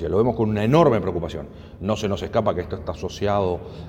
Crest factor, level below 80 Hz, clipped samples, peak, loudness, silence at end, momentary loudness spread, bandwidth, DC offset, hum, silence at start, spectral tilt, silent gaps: 18 dB; -42 dBFS; under 0.1%; -4 dBFS; -22 LUFS; 0 s; 14 LU; 16 kHz; under 0.1%; none; 0 s; -7 dB/octave; none